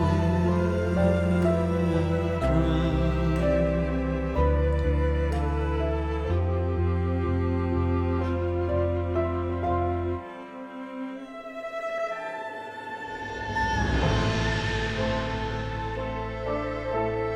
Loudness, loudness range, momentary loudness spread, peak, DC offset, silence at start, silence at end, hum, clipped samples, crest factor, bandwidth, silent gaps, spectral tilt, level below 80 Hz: -27 LUFS; 7 LU; 11 LU; -10 dBFS; under 0.1%; 0 s; 0 s; none; under 0.1%; 14 dB; 9.6 kHz; none; -7.5 dB/octave; -32 dBFS